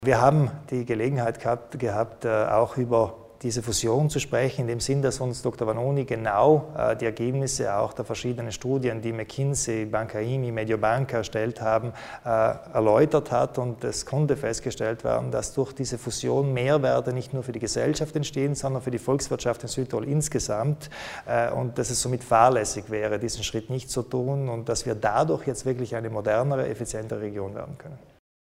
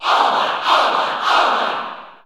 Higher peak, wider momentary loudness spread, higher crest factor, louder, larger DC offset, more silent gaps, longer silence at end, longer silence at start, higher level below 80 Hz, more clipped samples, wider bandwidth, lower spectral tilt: about the same, -4 dBFS vs -2 dBFS; about the same, 9 LU vs 8 LU; first, 22 dB vs 16 dB; second, -26 LUFS vs -16 LUFS; neither; neither; first, 0.55 s vs 0.1 s; about the same, 0 s vs 0 s; first, -50 dBFS vs -74 dBFS; neither; first, 16 kHz vs 14.5 kHz; first, -5.5 dB/octave vs -1.5 dB/octave